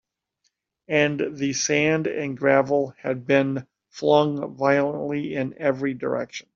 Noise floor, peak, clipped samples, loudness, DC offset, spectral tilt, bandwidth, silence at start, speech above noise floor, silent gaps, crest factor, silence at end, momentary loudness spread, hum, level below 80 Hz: -73 dBFS; -4 dBFS; under 0.1%; -23 LUFS; under 0.1%; -4.5 dB/octave; 7.4 kHz; 0.9 s; 50 dB; none; 20 dB; 0.15 s; 8 LU; none; -64 dBFS